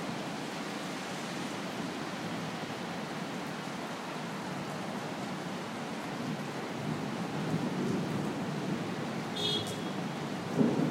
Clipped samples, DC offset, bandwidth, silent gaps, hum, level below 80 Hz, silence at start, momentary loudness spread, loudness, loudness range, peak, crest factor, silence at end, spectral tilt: under 0.1%; under 0.1%; 16 kHz; none; none; -70 dBFS; 0 s; 6 LU; -36 LUFS; 4 LU; -14 dBFS; 22 dB; 0 s; -5 dB/octave